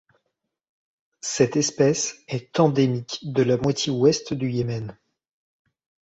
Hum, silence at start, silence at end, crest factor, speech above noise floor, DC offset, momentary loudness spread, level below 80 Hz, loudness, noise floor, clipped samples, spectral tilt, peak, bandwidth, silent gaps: none; 1.25 s; 1.1 s; 20 dB; 56 dB; under 0.1%; 10 LU; -58 dBFS; -23 LUFS; -78 dBFS; under 0.1%; -5 dB/octave; -4 dBFS; 8.2 kHz; none